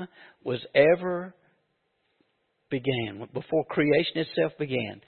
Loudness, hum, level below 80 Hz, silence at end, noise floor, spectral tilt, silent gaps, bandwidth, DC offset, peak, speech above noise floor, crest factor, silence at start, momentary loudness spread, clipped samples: -26 LUFS; none; -68 dBFS; 0.1 s; -74 dBFS; -10 dB/octave; none; 4.5 kHz; under 0.1%; -6 dBFS; 47 dB; 22 dB; 0 s; 14 LU; under 0.1%